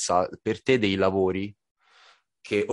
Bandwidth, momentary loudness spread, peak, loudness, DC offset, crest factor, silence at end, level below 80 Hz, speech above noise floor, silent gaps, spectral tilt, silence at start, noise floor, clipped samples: 11.5 kHz; 8 LU; -8 dBFS; -25 LUFS; under 0.1%; 18 dB; 0 s; -54 dBFS; 34 dB; 1.71-1.75 s; -4.5 dB/octave; 0 s; -59 dBFS; under 0.1%